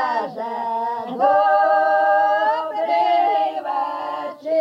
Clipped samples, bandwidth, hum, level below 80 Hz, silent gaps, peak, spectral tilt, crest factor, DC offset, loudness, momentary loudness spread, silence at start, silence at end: under 0.1%; 6.2 kHz; none; -90 dBFS; none; -6 dBFS; -4.5 dB/octave; 14 dB; under 0.1%; -19 LUFS; 10 LU; 0 s; 0 s